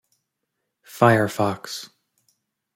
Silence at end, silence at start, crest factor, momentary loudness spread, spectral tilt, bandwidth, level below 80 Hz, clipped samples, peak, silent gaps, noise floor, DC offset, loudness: 0.9 s; 0.95 s; 22 dB; 24 LU; -6 dB/octave; 16.5 kHz; -64 dBFS; under 0.1%; -2 dBFS; none; -79 dBFS; under 0.1%; -20 LUFS